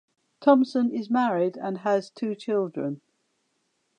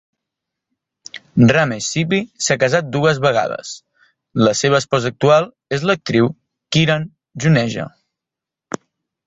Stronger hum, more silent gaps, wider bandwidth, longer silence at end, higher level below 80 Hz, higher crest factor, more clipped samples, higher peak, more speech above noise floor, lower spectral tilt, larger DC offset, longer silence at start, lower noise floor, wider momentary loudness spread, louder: neither; neither; first, 9.4 kHz vs 8.2 kHz; second, 1 s vs 1.4 s; second, -84 dBFS vs -52 dBFS; about the same, 20 dB vs 18 dB; neither; second, -6 dBFS vs 0 dBFS; second, 49 dB vs 70 dB; first, -7 dB/octave vs -5 dB/octave; neither; second, 0.4 s vs 1.15 s; second, -74 dBFS vs -85 dBFS; second, 12 LU vs 17 LU; second, -25 LUFS vs -17 LUFS